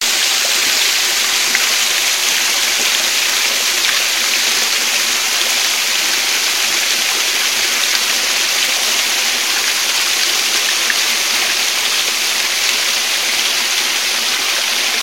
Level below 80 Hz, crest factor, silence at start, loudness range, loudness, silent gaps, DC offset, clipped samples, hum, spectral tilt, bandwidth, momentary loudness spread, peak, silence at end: -64 dBFS; 16 dB; 0 s; 1 LU; -12 LUFS; none; 0.5%; under 0.1%; none; 3 dB/octave; 16.5 kHz; 2 LU; 0 dBFS; 0 s